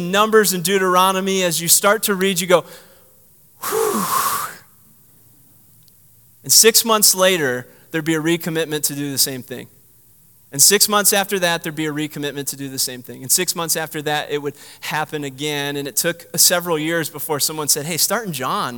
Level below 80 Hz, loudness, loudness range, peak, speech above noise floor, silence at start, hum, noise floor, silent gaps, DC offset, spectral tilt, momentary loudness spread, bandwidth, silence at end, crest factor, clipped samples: -66 dBFS; -17 LUFS; 6 LU; 0 dBFS; 33 dB; 0 s; none; -51 dBFS; none; 0.1%; -2 dB/octave; 13 LU; 19 kHz; 0 s; 20 dB; under 0.1%